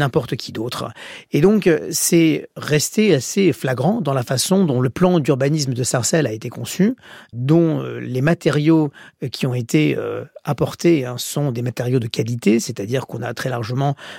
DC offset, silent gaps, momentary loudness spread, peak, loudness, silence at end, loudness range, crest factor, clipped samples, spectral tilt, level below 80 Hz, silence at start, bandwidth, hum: under 0.1%; none; 11 LU; -4 dBFS; -19 LUFS; 0 s; 3 LU; 16 dB; under 0.1%; -5.5 dB/octave; -54 dBFS; 0 s; 16.5 kHz; none